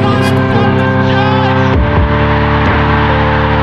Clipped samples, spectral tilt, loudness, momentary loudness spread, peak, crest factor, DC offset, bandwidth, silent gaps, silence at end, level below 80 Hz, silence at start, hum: under 0.1%; -7.5 dB/octave; -10 LUFS; 1 LU; 0 dBFS; 10 dB; under 0.1%; 12 kHz; none; 0 s; -20 dBFS; 0 s; none